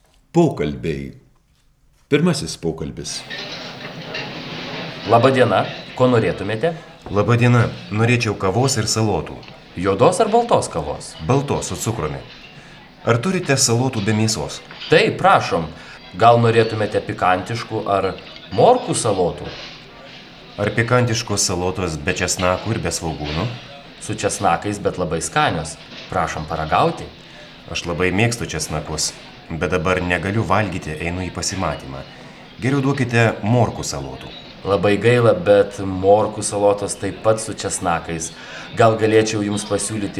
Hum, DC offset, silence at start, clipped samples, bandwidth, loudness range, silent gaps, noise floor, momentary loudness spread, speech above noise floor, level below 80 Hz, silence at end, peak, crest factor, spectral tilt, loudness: none; under 0.1%; 0.35 s; under 0.1%; 14 kHz; 5 LU; none; -57 dBFS; 17 LU; 39 dB; -44 dBFS; 0 s; 0 dBFS; 18 dB; -5 dB/octave; -19 LUFS